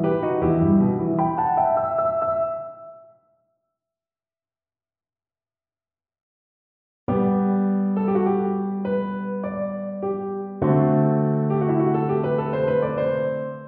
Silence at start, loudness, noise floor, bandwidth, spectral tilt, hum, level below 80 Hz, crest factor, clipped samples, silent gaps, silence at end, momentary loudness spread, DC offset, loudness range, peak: 0 s; -22 LUFS; under -90 dBFS; 3.7 kHz; -9.5 dB/octave; none; -52 dBFS; 16 dB; under 0.1%; 6.22-7.07 s; 0 s; 9 LU; under 0.1%; 8 LU; -6 dBFS